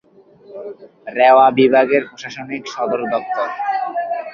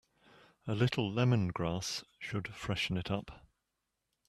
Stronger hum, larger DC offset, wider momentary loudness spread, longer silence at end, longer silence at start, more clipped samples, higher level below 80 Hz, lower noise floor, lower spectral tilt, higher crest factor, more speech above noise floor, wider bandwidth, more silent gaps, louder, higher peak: neither; neither; first, 22 LU vs 10 LU; second, 0 s vs 0.9 s; second, 0.5 s vs 0.65 s; neither; about the same, -64 dBFS vs -60 dBFS; second, -45 dBFS vs -85 dBFS; about the same, -5.5 dB/octave vs -5.5 dB/octave; about the same, 16 dB vs 20 dB; second, 30 dB vs 51 dB; second, 7.2 kHz vs 13.5 kHz; neither; first, -16 LUFS vs -35 LUFS; first, -2 dBFS vs -16 dBFS